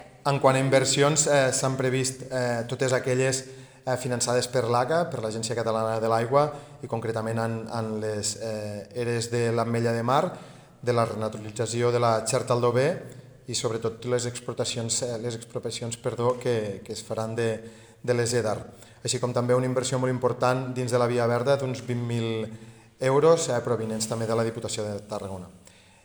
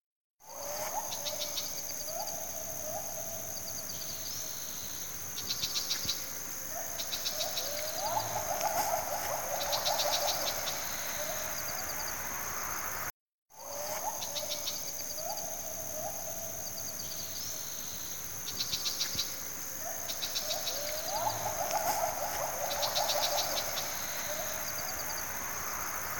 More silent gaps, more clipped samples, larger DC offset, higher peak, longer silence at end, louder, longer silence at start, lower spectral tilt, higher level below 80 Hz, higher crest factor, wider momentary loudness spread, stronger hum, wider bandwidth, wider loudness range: second, none vs 0.06-0.37 s, 13.10-13.46 s; neither; second, under 0.1% vs 0.3%; first, -6 dBFS vs -16 dBFS; first, 0.45 s vs 0 s; first, -26 LUFS vs -33 LUFS; about the same, 0 s vs 0 s; first, -4.5 dB/octave vs -0.5 dB/octave; about the same, -64 dBFS vs -62 dBFS; about the same, 20 dB vs 20 dB; first, 12 LU vs 6 LU; neither; first, over 20 kHz vs 18 kHz; about the same, 4 LU vs 5 LU